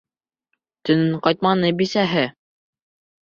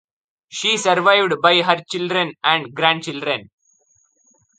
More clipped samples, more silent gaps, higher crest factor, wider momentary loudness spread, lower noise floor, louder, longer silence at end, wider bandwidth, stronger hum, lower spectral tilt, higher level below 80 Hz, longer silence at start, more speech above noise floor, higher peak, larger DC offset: neither; neither; about the same, 20 dB vs 20 dB; second, 5 LU vs 9 LU; first, -76 dBFS vs -61 dBFS; about the same, -19 LUFS vs -17 LUFS; second, 0.95 s vs 1.15 s; second, 7.4 kHz vs 9.6 kHz; neither; first, -6.5 dB/octave vs -3 dB/octave; first, -60 dBFS vs -68 dBFS; first, 0.85 s vs 0.5 s; first, 57 dB vs 43 dB; about the same, -2 dBFS vs 0 dBFS; neither